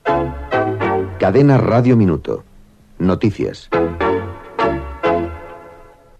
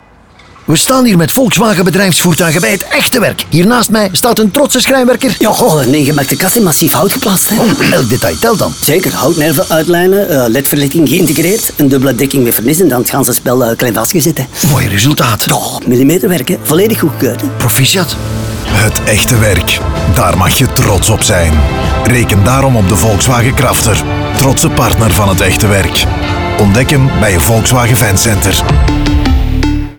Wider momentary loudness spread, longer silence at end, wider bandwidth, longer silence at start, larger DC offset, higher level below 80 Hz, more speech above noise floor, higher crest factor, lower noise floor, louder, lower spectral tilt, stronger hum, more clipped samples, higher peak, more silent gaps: first, 14 LU vs 4 LU; first, 0.35 s vs 0.05 s; second, 8.6 kHz vs over 20 kHz; second, 0.05 s vs 0.7 s; neither; second, -38 dBFS vs -22 dBFS; about the same, 31 dB vs 30 dB; first, 16 dB vs 8 dB; first, -45 dBFS vs -39 dBFS; second, -17 LUFS vs -9 LUFS; first, -8.5 dB/octave vs -4.5 dB/octave; neither; neither; about the same, 0 dBFS vs 0 dBFS; neither